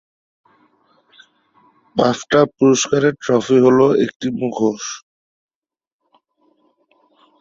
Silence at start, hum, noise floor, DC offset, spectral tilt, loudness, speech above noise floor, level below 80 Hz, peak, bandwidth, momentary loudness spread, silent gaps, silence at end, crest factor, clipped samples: 1.95 s; none; -61 dBFS; under 0.1%; -5 dB/octave; -16 LUFS; 46 dB; -58 dBFS; -2 dBFS; 7.8 kHz; 12 LU; 4.16-4.20 s; 2.45 s; 18 dB; under 0.1%